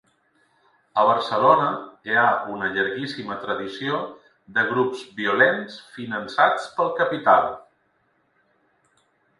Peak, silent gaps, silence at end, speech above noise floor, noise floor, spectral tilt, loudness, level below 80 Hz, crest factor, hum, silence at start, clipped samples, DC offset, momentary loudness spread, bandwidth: -2 dBFS; none; 1.8 s; 45 dB; -67 dBFS; -5.5 dB/octave; -22 LUFS; -66 dBFS; 22 dB; none; 0.95 s; under 0.1%; under 0.1%; 13 LU; 11.5 kHz